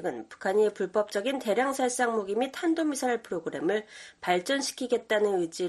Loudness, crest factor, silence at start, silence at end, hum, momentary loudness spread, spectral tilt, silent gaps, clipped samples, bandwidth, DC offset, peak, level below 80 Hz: -28 LUFS; 16 dB; 0 s; 0 s; none; 7 LU; -3.5 dB/octave; none; under 0.1%; 13 kHz; under 0.1%; -12 dBFS; -72 dBFS